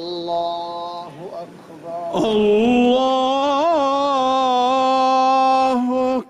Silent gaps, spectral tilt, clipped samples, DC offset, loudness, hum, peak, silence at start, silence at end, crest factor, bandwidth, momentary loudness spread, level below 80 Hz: none; -5 dB/octave; under 0.1%; under 0.1%; -17 LUFS; none; -8 dBFS; 0 s; 0.05 s; 10 dB; 11.5 kHz; 17 LU; -54 dBFS